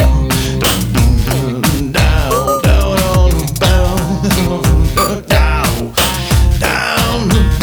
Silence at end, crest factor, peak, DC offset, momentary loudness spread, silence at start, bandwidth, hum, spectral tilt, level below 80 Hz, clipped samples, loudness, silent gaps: 0 s; 12 dB; 0 dBFS; under 0.1%; 3 LU; 0 s; over 20 kHz; none; -5 dB/octave; -16 dBFS; under 0.1%; -13 LUFS; none